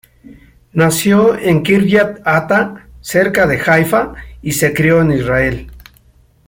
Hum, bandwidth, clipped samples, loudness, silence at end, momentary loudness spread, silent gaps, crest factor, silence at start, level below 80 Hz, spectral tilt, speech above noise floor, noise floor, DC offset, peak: none; 17 kHz; under 0.1%; -13 LUFS; 0.7 s; 11 LU; none; 14 dB; 0.3 s; -38 dBFS; -5.5 dB/octave; 37 dB; -49 dBFS; under 0.1%; 0 dBFS